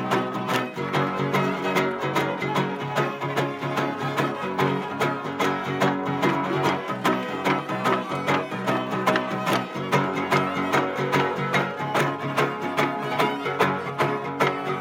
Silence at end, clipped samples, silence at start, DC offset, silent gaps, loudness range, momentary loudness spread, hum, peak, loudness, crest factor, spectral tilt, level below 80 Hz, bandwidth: 0 s; under 0.1%; 0 s; under 0.1%; none; 2 LU; 3 LU; none; -6 dBFS; -24 LUFS; 18 dB; -5.5 dB/octave; -68 dBFS; 17 kHz